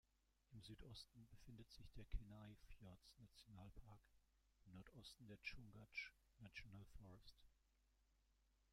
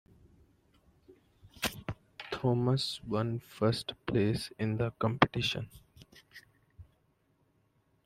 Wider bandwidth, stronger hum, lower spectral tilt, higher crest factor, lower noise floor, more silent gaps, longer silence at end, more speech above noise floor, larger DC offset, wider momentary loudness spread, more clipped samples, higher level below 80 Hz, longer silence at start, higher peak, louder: about the same, 15.5 kHz vs 16 kHz; neither; about the same, -4.5 dB/octave vs -5.5 dB/octave; about the same, 26 dB vs 28 dB; first, -82 dBFS vs -72 dBFS; neither; second, 0 s vs 1.2 s; second, 23 dB vs 41 dB; neither; second, 12 LU vs 16 LU; neither; second, -66 dBFS vs -60 dBFS; second, 0.45 s vs 1.1 s; second, -36 dBFS vs -6 dBFS; second, -61 LUFS vs -33 LUFS